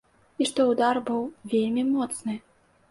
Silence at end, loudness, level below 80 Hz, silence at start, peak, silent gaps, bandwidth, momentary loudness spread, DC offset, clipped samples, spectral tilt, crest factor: 0.5 s; -26 LUFS; -68 dBFS; 0.4 s; -10 dBFS; none; 11.5 kHz; 10 LU; under 0.1%; under 0.1%; -4 dB/octave; 16 dB